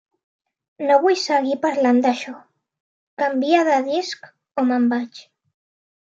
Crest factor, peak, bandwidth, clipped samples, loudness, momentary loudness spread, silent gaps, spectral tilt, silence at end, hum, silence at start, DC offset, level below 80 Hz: 18 dB; -4 dBFS; 7.8 kHz; under 0.1%; -19 LUFS; 14 LU; 2.80-3.17 s; -3.5 dB/octave; 0.9 s; none; 0.8 s; under 0.1%; -80 dBFS